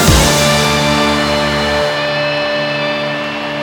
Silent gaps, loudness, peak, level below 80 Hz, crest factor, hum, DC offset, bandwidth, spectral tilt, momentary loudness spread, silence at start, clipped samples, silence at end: none; -13 LUFS; 0 dBFS; -26 dBFS; 14 dB; none; under 0.1%; 19.5 kHz; -3.5 dB/octave; 7 LU; 0 s; under 0.1%; 0 s